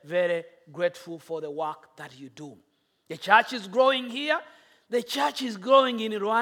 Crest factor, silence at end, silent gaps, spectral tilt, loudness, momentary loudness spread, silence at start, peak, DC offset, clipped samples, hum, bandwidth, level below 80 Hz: 24 dB; 0 s; none; -3.5 dB/octave; -26 LUFS; 23 LU; 0.05 s; -4 dBFS; under 0.1%; under 0.1%; none; 17 kHz; -82 dBFS